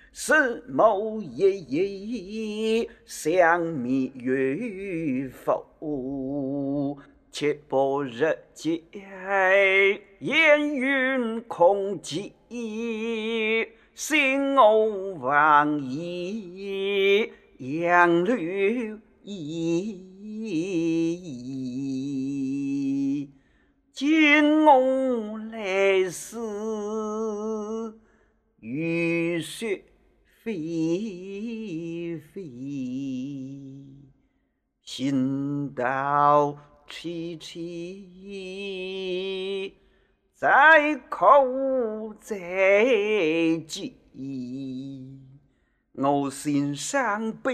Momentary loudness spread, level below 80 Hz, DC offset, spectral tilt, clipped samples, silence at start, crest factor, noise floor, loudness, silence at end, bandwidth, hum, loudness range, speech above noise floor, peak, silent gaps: 18 LU; -64 dBFS; under 0.1%; -5 dB/octave; under 0.1%; 0.15 s; 22 dB; -73 dBFS; -24 LUFS; 0 s; 14.5 kHz; none; 10 LU; 48 dB; -4 dBFS; none